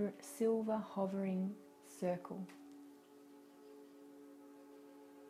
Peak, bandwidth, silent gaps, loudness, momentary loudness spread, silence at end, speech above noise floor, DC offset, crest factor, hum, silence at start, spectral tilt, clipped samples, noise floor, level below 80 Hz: -26 dBFS; 15.5 kHz; none; -41 LUFS; 23 LU; 0 s; 22 dB; under 0.1%; 18 dB; none; 0 s; -7 dB/octave; under 0.1%; -61 dBFS; -88 dBFS